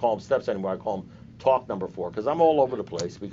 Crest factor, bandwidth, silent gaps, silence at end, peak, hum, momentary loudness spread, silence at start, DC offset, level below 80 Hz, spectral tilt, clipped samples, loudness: 16 dB; 7.8 kHz; none; 0 s; -8 dBFS; none; 12 LU; 0 s; under 0.1%; -60 dBFS; -5.5 dB/octave; under 0.1%; -26 LUFS